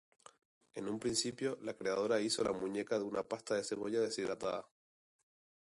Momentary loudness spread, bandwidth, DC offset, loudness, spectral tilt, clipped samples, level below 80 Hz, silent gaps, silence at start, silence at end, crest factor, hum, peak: 7 LU; 11.5 kHz; under 0.1%; -38 LUFS; -3.5 dB/octave; under 0.1%; -72 dBFS; none; 0.75 s; 1.15 s; 18 dB; none; -20 dBFS